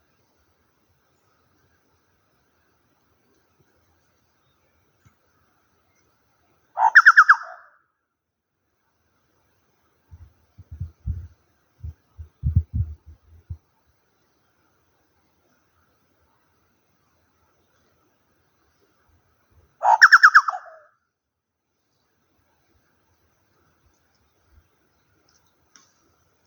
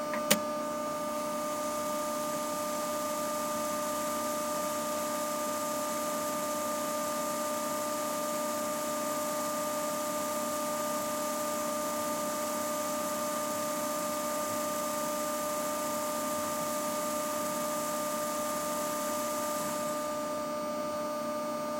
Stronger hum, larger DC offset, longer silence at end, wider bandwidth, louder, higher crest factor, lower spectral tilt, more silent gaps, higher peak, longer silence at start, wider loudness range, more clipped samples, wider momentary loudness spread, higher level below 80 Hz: neither; neither; first, 5.9 s vs 0 s; first, over 20 kHz vs 16.5 kHz; first, -15 LUFS vs -33 LUFS; about the same, 26 dB vs 26 dB; about the same, -3 dB/octave vs -2.5 dB/octave; neither; first, 0 dBFS vs -8 dBFS; first, 6.75 s vs 0 s; first, 23 LU vs 0 LU; neither; first, 31 LU vs 2 LU; first, -44 dBFS vs -74 dBFS